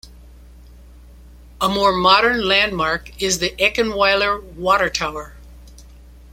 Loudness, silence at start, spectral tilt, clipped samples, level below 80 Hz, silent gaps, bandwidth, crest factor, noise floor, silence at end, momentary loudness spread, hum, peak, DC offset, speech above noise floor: -17 LUFS; 0.05 s; -2.5 dB/octave; under 0.1%; -40 dBFS; none; 16.5 kHz; 20 dB; -42 dBFS; 0.3 s; 10 LU; none; 0 dBFS; under 0.1%; 24 dB